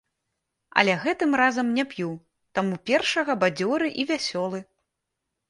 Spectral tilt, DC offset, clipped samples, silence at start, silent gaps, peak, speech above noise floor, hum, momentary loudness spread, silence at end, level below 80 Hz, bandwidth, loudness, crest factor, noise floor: -4.5 dB/octave; under 0.1%; under 0.1%; 0.75 s; none; 0 dBFS; 58 dB; none; 11 LU; 0.85 s; -68 dBFS; 11.5 kHz; -24 LUFS; 24 dB; -82 dBFS